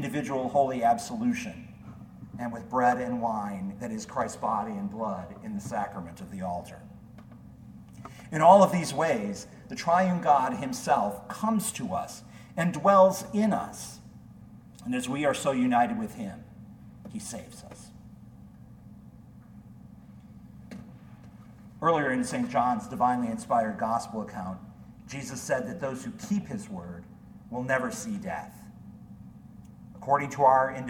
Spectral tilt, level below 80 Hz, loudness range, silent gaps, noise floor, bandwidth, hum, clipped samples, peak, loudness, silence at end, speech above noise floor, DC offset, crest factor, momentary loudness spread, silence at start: -5.5 dB/octave; -60 dBFS; 17 LU; none; -50 dBFS; 18 kHz; none; under 0.1%; -4 dBFS; -28 LUFS; 0 s; 22 dB; under 0.1%; 24 dB; 25 LU; 0 s